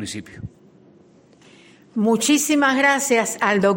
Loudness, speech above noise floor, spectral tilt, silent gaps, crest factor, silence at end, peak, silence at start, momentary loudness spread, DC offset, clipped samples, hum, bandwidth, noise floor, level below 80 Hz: -18 LUFS; 33 dB; -3.5 dB/octave; none; 16 dB; 0 s; -4 dBFS; 0 s; 21 LU; under 0.1%; under 0.1%; none; 17 kHz; -52 dBFS; -60 dBFS